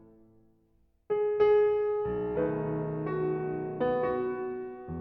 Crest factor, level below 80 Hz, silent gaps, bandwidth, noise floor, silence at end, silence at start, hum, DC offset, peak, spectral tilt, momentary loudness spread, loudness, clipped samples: 16 dB; -58 dBFS; none; 4.6 kHz; -68 dBFS; 0 s; 1.1 s; none; under 0.1%; -14 dBFS; -10.5 dB/octave; 10 LU; -30 LUFS; under 0.1%